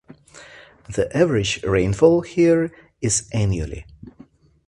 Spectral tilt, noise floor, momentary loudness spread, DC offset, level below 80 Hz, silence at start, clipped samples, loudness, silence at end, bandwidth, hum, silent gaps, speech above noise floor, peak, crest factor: -5 dB/octave; -50 dBFS; 12 LU; under 0.1%; -40 dBFS; 0.35 s; under 0.1%; -20 LUFS; 0.6 s; 11.5 kHz; none; none; 31 dB; -2 dBFS; 20 dB